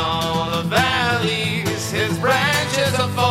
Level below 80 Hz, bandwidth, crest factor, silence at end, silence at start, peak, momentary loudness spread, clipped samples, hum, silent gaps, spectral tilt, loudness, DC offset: -46 dBFS; 16 kHz; 16 dB; 0 s; 0 s; -4 dBFS; 4 LU; under 0.1%; none; none; -4 dB/octave; -19 LUFS; 0.2%